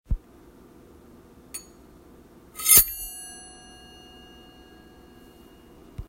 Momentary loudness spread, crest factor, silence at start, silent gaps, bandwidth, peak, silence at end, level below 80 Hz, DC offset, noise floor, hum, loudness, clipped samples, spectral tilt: 29 LU; 30 dB; 0.1 s; none; 16 kHz; 0 dBFS; 0.05 s; -42 dBFS; under 0.1%; -51 dBFS; none; -19 LUFS; under 0.1%; -0.5 dB/octave